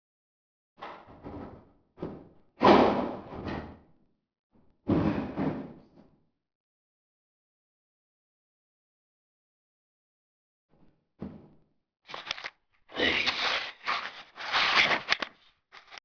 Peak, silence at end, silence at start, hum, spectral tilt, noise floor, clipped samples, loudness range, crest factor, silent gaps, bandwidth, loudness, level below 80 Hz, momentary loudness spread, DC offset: -6 dBFS; 0.1 s; 0.8 s; none; -5 dB/octave; -66 dBFS; under 0.1%; 16 LU; 26 dB; 4.39-4.50 s, 6.55-10.69 s; 5.4 kHz; -27 LUFS; -58 dBFS; 24 LU; under 0.1%